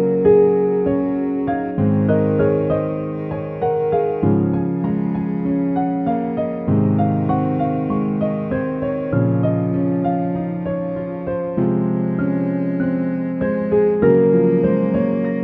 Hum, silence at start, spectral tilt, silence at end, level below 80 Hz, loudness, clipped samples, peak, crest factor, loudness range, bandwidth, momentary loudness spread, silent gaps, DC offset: none; 0 s; -12.5 dB/octave; 0 s; -48 dBFS; -19 LUFS; under 0.1%; -2 dBFS; 16 dB; 3 LU; 3.9 kHz; 8 LU; none; under 0.1%